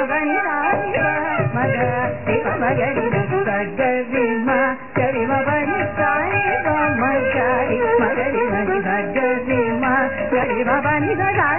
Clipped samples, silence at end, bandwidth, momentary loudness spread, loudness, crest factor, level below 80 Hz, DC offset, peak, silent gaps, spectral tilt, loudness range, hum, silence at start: under 0.1%; 0 s; 3.1 kHz; 3 LU; -19 LUFS; 14 dB; -46 dBFS; 1%; -4 dBFS; none; -12 dB/octave; 1 LU; none; 0 s